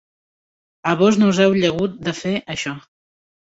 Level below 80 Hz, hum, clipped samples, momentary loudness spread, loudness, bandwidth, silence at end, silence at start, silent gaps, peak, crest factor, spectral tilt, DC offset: -54 dBFS; none; under 0.1%; 12 LU; -18 LUFS; 8 kHz; 0.65 s; 0.85 s; none; -2 dBFS; 18 dB; -5.5 dB/octave; under 0.1%